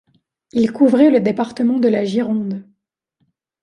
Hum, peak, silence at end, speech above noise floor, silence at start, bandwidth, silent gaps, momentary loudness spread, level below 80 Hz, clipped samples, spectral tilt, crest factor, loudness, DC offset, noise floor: none; -2 dBFS; 1 s; 55 dB; 0.55 s; 10.5 kHz; none; 11 LU; -62 dBFS; under 0.1%; -7.5 dB/octave; 16 dB; -16 LUFS; under 0.1%; -71 dBFS